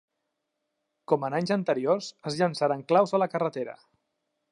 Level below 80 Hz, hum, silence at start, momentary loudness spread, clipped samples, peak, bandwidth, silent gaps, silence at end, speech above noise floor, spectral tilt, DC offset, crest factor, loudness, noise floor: -78 dBFS; none; 1.1 s; 8 LU; under 0.1%; -8 dBFS; 11 kHz; none; 0.8 s; 55 dB; -6 dB/octave; under 0.1%; 20 dB; -27 LUFS; -81 dBFS